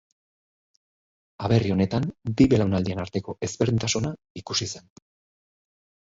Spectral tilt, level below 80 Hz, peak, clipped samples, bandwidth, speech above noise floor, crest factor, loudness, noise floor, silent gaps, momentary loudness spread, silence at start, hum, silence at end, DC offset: -5.5 dB/octave; -46 dBFS; -6 dBFS; under 0.1%; 7.8 kHz; over 66 dB; 20 dB; -25 LUFS; under -90 dBFS; 4.30-4.35 s; 13 LU; 1.4 s; none; 1.25 s; under 0.1%